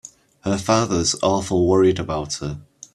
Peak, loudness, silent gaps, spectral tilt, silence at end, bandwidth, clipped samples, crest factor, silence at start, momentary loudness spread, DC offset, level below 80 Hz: -2 dBFS; -20 LUFS; none; -5 dB/octave; 0.3 s; 12.5 kHz; under 0.1%; 18 dB; 0.05 s; 13 LU; under 0.1%; -46 dBFS